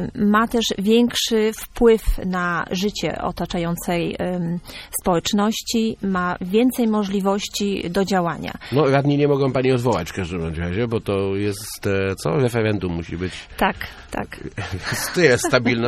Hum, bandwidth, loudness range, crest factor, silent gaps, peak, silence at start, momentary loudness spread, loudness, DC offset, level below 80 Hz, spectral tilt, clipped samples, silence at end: none; 15.5 kHz; 3 LU; 18 dB; none; -2 dBFS; 0 s; 10 LU; -21 LUFS; under 0.1%; -38 dBFS; -5 dB/octave; under 0.1%; 0 s